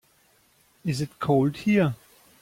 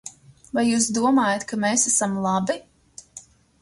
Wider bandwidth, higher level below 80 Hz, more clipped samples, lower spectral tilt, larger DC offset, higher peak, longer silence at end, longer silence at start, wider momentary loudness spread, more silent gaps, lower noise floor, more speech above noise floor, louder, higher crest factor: first, 16 kHz vs 11.5 kHz; about the same, -60 dBFS vs -62 dBFS; neither; first, -7 dB/octave vs -3.5 dB/octave; neither; second, -10 dBFS vs -6 dBFS; about the same, 0.45 s vs 0.4 s; first, 0.85 s vs 0.05 s; second, 11 LU vs 16 LU; neither; first, -62 dBFS vs -47 dBFS; first, 39 dB vs 26 dB; second, -25 LUFS vs -21 LUFS; about the same, 16 dB vs 16 dB